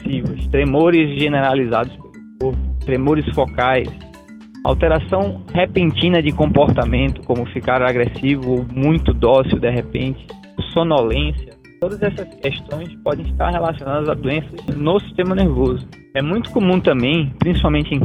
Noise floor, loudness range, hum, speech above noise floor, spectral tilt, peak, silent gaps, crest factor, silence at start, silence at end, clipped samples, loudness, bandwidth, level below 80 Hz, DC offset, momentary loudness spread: -39 dBFS; 5 LU; none; 22 dB; -8.5 dB/octave; 0 dBFS; none; 16 dB; 0 s; 0 s; under 0.1%; -18 LUFS; 9 kHz; -28 dBFS; under 0.1%; 10 LU